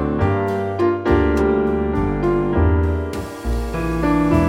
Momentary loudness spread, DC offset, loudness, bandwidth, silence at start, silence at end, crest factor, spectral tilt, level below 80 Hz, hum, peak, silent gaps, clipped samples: 7 LU; under 0.1%; -19 LUFS; 15.5 kHz; 0 s; 0 s; 14 dB; -8.5 dB/octave; -26 dBFS; none; -4 dBFS; none; under 0.1%